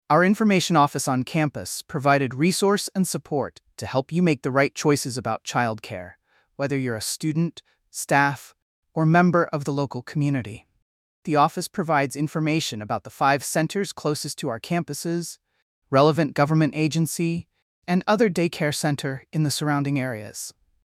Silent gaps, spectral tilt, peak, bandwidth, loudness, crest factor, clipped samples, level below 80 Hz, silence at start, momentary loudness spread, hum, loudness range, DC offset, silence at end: 8.62-8.83 s, 10.82-11.23 s, 15.62-15.82 s, 17.62-17.82 s; -5 dB/octave; -6 dBFS; 15.5 kHz; -23 LUFS; 18 dB; under 0.1%; -64 dBFS; 0.1 s; 13 LU; none; 3 LU; under 0.1%; 0.4 s